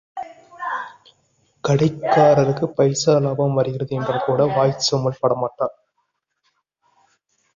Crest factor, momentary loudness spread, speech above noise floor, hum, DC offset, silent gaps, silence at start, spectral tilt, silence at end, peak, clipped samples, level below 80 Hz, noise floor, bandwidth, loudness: 18 dB; 14 LU; 54 dB; none; under 0.1%; none; 0.15 s; -5.5 dB/octave; 1.85 s; -2 dBFS; under 0.1%; -58 dBFS; -72 dBFS; 7.4 kHz; -19 LUFS